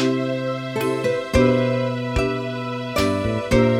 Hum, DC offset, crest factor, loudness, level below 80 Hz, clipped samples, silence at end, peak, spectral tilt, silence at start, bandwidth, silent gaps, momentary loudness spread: none; under 0.1%; 16 dB; -21 LUFS; -34 dBFS; under 0.1%; 0 s; -4 dBFS; -6.5 dB/octave; 0 s; 16.5 kHz; none; 7 LU